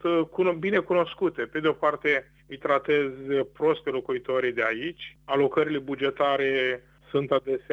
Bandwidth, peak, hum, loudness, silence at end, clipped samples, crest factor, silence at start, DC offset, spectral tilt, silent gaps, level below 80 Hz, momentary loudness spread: 7.2 kHz; -10 dBFS; none; -26 LUFS; 0 s; under 0.1%; 16 dB; 0 s; under 0.1%; -7 dB/octave; none; -62 dBFS; 7 LU